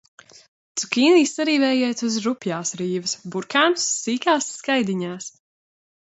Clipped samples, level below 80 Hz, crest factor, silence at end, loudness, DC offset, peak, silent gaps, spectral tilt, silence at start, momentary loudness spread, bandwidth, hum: under 0.1%; -72 dBFS; 18 dB; 0.85 s; -21 LUFS; under 0.1%; -4 dBFS; none; -3 dB/octave; 0.75 s; 12 LU; 8.2 kHz; none